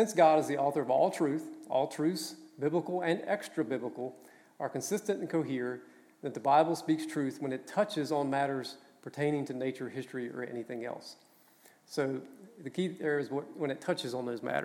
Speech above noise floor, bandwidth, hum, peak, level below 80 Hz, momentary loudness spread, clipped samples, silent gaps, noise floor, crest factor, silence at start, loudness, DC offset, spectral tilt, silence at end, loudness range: 30 dB; 17 kHz; none; -12 dBFS; -88 dBFS; 14 LU; under 0.1%; none; -62 dBFS; 20 dB; 0 s; -33 LUFS; under 0.1%; -5.5 dB/octave; 0 s; 7 LU